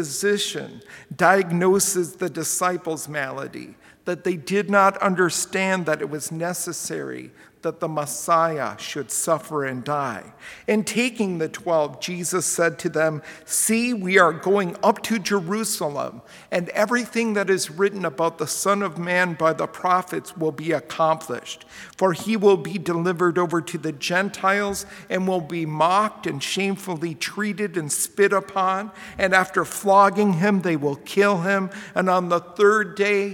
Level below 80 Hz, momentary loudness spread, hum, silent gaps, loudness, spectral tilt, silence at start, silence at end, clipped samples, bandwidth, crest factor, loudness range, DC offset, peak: -64 dBFS; 11 LU; none; none; -22 LUFS; -4 dB/octave; 0 s; 0 s; under 0.1%; 18 kHz; 22 dB; 5 LU; under 0.1%; -2 dBFS